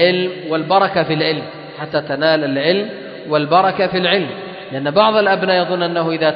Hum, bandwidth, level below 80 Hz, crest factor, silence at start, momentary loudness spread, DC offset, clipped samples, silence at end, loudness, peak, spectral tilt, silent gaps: none; 5.4 kHz; -60 dBFS; 16 dB; 0 s; 12 LU; under 0.1%; under 0.1%; 0 s; -16 LUFS; 0 dBFS; -10 dB/octave; none